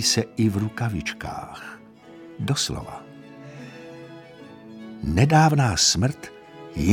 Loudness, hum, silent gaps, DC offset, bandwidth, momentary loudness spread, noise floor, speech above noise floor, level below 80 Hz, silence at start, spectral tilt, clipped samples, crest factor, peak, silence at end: -22 LUFS; none; none; under 0.1%; 17 kHz; 25 LU; -45 dBFS; 23 dB; -44 dBFS; 0 s; -4 dB/octave; under 0.1%; 20 dB; -4 dBFS; 0 s